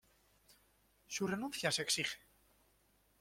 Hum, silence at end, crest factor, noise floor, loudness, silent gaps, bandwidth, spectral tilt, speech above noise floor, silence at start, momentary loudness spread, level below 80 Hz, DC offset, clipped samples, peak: 50 Hz at -65 dBFS; 1.05 s; 22 dB; -74 dBFS; -37 LUFS; none; 16.5 kHz; -2.5 dB/octave; 35 dB; 0.5 s; 10 LU; -74 dBFS; under 0.1%; under 0.1%; -20 dBFS